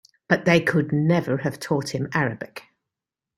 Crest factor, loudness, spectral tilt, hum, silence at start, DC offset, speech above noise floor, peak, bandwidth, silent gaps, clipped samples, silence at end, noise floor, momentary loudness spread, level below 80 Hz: 20 dB; -22 LUFS; -6.5 dB/octave; none; 0.3 s; under 0.1%; 65 dB; -4 dBFS; 13.5 kHz; none; under 0.1%; 0.75 s; -87 dBFS; 13 LU; -60 dBFS